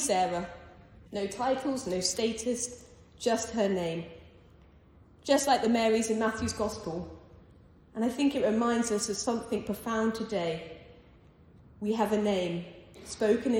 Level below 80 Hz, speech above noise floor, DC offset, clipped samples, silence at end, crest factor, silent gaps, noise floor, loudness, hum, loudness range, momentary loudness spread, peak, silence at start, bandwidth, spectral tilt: -58 dBFS; 28 dB; under 0.1%; under 0.1%; 0 s; 18 dB; none; -57 dBFS; -30 LUFS; none; 3 LU; 17 LU; -14 dBFS; 0 s; 17 kHz; -4 dB/octave